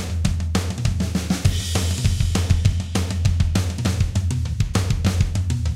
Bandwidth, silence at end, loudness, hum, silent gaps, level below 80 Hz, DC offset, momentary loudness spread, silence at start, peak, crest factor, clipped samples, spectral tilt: 15 kHz; 0 s; -22 LUFS; none; none; -28 dBFS; under 0.1%; 4 LU; 0 s; -4 dBFS; 16 dB; under 0.1%; -5.5 dB/octave